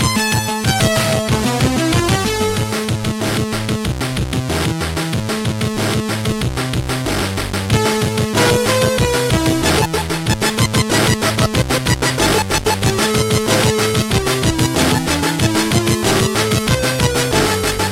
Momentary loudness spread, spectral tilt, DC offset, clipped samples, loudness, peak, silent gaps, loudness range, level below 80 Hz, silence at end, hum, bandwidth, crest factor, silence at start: 5 LU; -4 dB/octave; under 0.1%; under 0.1%; -16 LUFS; 0 dBFS; none; 4 LU; -30 dBFS; 0 s; none; 16 kHz; 16 dB; 0 s